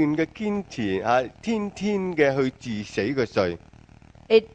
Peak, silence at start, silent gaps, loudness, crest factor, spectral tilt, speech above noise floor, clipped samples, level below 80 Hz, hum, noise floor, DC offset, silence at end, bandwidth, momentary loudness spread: -4 dBFS; 0 s; none; -25 LUFS; 20 dB; -6 dB/octave; 26 dB; under 0.1%; -54 dBFS; none; -50 dBFS; under 0.1%; 0.05 s; 8.6 kHz; 7 LU